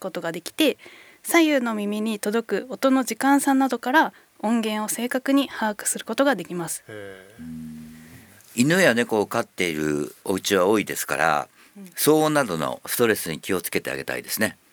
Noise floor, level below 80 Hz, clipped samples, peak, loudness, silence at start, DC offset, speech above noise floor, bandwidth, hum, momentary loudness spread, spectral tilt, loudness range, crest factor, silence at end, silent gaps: -48 dBFS; -64 dBFS; under 0.1%; -4 dBFS; -23 LUFS; 0 s; under 0.1%; 25 dB; over 20 kHz; none; 17 LU; -4 dB/octave; 4 LU; 20 dB; 0.2 s; none